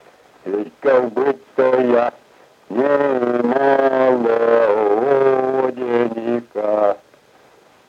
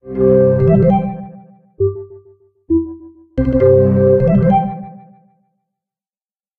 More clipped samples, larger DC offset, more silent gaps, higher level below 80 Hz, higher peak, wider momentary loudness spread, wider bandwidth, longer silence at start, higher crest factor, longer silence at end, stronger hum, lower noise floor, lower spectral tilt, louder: neither; neither; neither; second, -68 dBFS vs -34 dBFS; about the same, -2 dBFS vs 0 dBFS; second, 9 LU vs 19 LU; first, 7.2 kHz vs 4.1 kHz; first, 0.45 s vs 0.05 s; about the same, 14 dB vs 14 dB; second, 0.9 s vs 1.65 s; neither; second, -50 dBFS vs under -90 dBFS; second, -7.5 dB/octave vs -12.5 dB/octave; second, -17 LUFS vs -14 LUFS